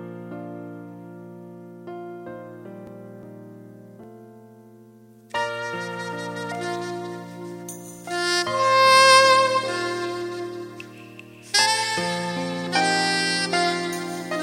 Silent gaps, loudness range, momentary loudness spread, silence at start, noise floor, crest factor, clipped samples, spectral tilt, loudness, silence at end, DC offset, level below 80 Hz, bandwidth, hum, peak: none; 22 LU; 25 LU; 0 s; -49 dBFS; 22 dB; under 0.1%; -2.5 dB/octave; -21 LUFS; 0 s; under 0.1%; -70 dBFS; 16 kHz; none; -2 dBFS